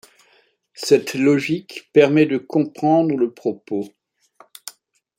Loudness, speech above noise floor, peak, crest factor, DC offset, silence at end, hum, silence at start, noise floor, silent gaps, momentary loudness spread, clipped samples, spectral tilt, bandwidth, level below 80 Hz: -19 LUFS; 41 dB; -2 dBFS; 18 dB; under 0.1%; 0.5 s; none; 0.8 s; -59 dBFS; none; 21 LU; under 0.1%; -6 dB/octave; 16.5 kHz; -68 dBFS